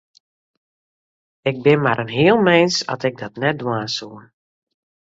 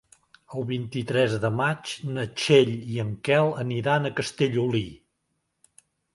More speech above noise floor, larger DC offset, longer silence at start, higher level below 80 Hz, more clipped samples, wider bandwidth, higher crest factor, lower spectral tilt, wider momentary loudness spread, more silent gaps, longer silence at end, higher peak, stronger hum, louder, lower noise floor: first, over 72 dB vs 52 dB; neither; first, 1.45 s vs 0.5 s; about the same, -60 dBFS vs -60 dBFS; neither; second, 8 kHz vs 11.5 kHz; about the same, 18 dB vs 20 dB; about the same, -5 dB/octave vs -5.5 dB/octave; about the same, 12 LU vs 11 LU; neither; second, 0.9 s vs 1.2 s; first, -2 dBFS vs -6 dBFS; neither; first, -18 LUFS vs -25 LUFS; first, under -90 dBFS vs -76 dBFS